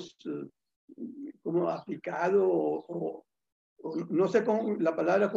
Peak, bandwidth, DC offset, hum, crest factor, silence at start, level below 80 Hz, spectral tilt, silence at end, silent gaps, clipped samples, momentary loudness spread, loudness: -14 dBFS; 7.6 kHz; under 0.1%; none; 18 dB; 0 s; -78 dBFS; -7.5 dB/octave; 0 s; 0.76-0.88 s, 3.52-3.76 s; under 0.1%; 17 LU; -30 LUFS